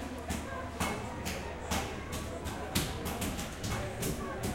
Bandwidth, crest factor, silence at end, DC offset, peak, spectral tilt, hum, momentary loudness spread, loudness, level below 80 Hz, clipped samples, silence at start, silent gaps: 16.5 kHz; 24 dB; 0 s; under 0.1%; -12 dBFS; -4 dB/octave; none; 5 LU; -37 LUFS; -46 dBFS; under 0.1%; 0 s; none